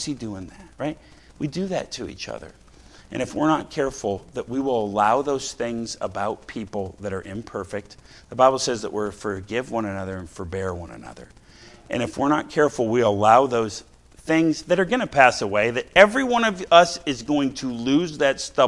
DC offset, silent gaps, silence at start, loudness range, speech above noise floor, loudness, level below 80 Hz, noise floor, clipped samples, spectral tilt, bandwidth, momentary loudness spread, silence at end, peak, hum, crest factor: under 0.1%; none; 0 s; 10 LU; 25 dB; -22 LUFS; -52 dBFS; -48 dBFS; under 0.1%; -4.5 dB/octave; 12 kHz; 17 LU; 0 s; 0 dBFS; none; 22 dB